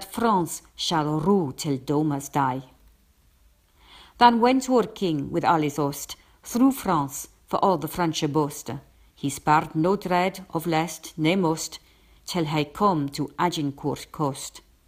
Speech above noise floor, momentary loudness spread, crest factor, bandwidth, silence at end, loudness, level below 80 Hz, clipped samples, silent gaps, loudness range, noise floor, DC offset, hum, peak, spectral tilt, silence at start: 36 dB; 12 LU; 22 dB; 16 kHz; 0.3 s; -24 LUFS; -56 dBFS; under 0.1%; none; 3 LU; -60 dBFS; under 0.1%; none; -2 dBFS; -5 dB/octave; 0 s